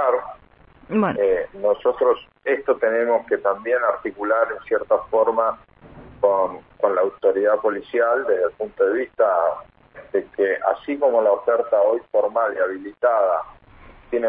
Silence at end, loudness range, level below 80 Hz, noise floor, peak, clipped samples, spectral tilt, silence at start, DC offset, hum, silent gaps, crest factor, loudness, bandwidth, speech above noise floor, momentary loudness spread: 0 s; 1 LU; -56 dBFS; -51 dBFS; -4 dBFS; under 0.1%; -10 dB/octave; 0 s; under 0.1%; none; none; 16 dB; -21 LUFS; 3.9 kHz; 31 dB; 7 LU